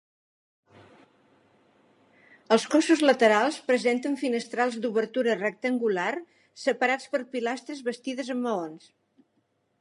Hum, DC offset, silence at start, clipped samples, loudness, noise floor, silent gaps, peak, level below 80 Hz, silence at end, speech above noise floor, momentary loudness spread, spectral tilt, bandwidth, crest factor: none; under 0.1%; 2.5 s; under 0.1%; -26 LUFS; -72 dBFS; none; -6 dBFS; -84 dBFS; 1.05 s; 47 dB; 12 LU; -4 dB/octave; 11.5 kHz; 22 dB